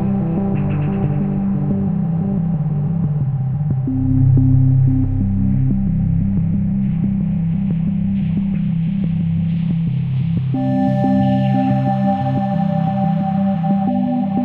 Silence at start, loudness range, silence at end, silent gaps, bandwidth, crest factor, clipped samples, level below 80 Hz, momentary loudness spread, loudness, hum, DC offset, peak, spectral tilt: 0 s; 3 LU; 0 s; none; 4.3 kHz; 12 dB; under 0.1%; -30 dBFS; 4 LU; -18 LUFS; none; under 0.1%; -4 dBFS; -11.5 dB/octave